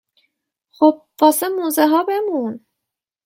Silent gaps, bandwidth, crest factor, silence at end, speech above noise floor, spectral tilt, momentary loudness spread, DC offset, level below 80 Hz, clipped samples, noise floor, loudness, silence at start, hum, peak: none; 16.5 kHz; 18 dB; 0.7 s; 66 dB; -3.5 dB/octave; 9 LU; under 0.1%; -70 dBFS; under 0.1%; -82 dBFS; -17 LUFS; 0.8 s; none; 0 dBFS